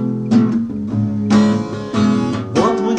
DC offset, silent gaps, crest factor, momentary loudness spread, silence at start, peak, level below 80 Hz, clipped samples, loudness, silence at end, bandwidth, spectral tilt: under 0.1%; none; 14 dB; 7 LU; 0 s; -2 dBFS; -48 dBFS; under 0.1%; -16 LUFS; 0 s; 9.2 kHz; -7 dB/octave